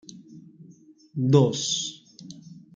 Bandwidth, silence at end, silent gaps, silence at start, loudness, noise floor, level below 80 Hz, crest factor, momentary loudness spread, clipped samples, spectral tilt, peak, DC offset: 9.4 kHz; 0.25 s; none; 0.15 s; -23 LUFS; -52 dBFS; -68 dBFS; 22 dB; 25 LU; under 0.1%; -5.5 dB/octave; -4 dBFS; under 0.1%